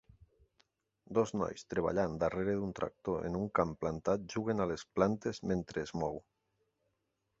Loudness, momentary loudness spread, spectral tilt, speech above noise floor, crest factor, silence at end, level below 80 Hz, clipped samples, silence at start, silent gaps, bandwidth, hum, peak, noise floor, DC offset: -36 LUFS; 6 LU; -6.5 dB/octave; 48 dB; 24 dB; 1.2 s; -58 dBFS; under 0.1%; 1.1 s; none; 7.6 kHz; none; -14 dBFS; -83 dBFS; under 0.1%